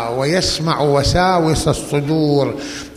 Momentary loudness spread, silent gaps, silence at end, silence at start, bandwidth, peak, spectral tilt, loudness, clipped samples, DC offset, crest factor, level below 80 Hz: 5 LU; none; 0 s; 0 s; 15 kHz; -2 dBFS; -5 dB/octave; -16 LUFS; under 0.1%; under 0.1%; 14 dB; -32 dBFS